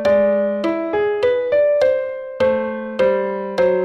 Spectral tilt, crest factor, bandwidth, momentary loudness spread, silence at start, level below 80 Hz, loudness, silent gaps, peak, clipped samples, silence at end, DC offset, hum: -6.5 dB/octave; 12 dB; 8 kHz; 7 LU; 0 s; -54 dBFS; -18 LUFS; none; -6 dBFS; under 0.1%; 0 s; under 0.1%; none